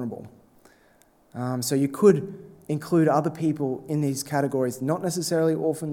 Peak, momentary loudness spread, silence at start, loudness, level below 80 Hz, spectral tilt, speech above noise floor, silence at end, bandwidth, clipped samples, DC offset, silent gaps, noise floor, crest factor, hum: -6 dBFS; 14 LU; 0 s; -24 LUFS; -68 dBFS; -6 dB/octave; 35 dB; 0 s; 18 kHz; under 0.1%; under 0.1%; none; -59 dBFS; 20 dB; none